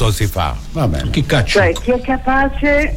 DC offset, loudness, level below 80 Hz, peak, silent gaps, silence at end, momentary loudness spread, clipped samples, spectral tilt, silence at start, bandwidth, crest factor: under 0.1%; -16 LUFS; -24 dBFS; -4 dBFS; none; 0 s; 6 LU; under 0.1%; -5.5 dB/octave; 0 s; 16.5 kHz; 10 dB